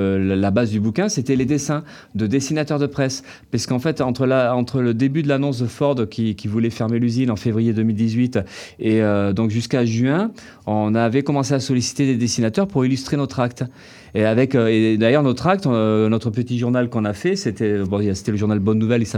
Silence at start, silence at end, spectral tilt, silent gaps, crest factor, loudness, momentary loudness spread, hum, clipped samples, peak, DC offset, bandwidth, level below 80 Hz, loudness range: 0 s; 0 s; -6.5 dB/octave; none; 16 dB; -19 LUFS; 6 LU; none; under 0.1%; -2 dBFS; under 0.1%; 14 kHz; -56 dBFS; 2 LU